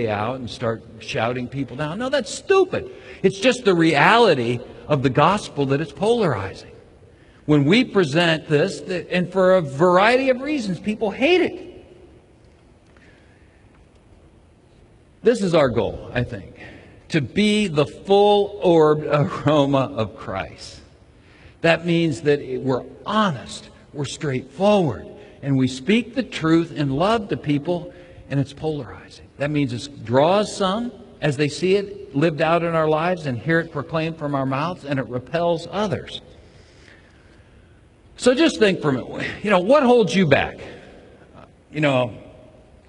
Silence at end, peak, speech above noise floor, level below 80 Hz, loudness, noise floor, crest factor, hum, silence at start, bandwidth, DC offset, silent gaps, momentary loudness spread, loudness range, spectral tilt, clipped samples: 0.55 s; 0 dBFS; 32 dB; -50 dBFS; -20 LUFS; -52 dBFS; 20 dB; none; 0 s; 11 kHz; under 0.1%; none; 13 LU; 6 LU; -6 dB/octave; under 0.1%